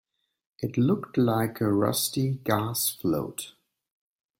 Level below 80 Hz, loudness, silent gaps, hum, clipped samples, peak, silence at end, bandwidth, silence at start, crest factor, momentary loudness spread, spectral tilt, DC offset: -62 dBFS; -26 LUFS; none; none; under 0.1%; -8 dBFS; 0.9 s; 16.5 kHz; 0.6 s; 18 dB; 11 LU; -5 dB/octave; under 0.1%